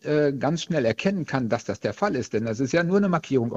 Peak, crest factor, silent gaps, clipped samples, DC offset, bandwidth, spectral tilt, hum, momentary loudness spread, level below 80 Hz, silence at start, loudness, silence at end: -6 dBFS; 18 dB; none; under 0.1%; under 0.1%; 8 kHz; -6.5 dB/octave; none; 5 LU; -58 dBFS; 0.05 s; -24 LUFS; 0 s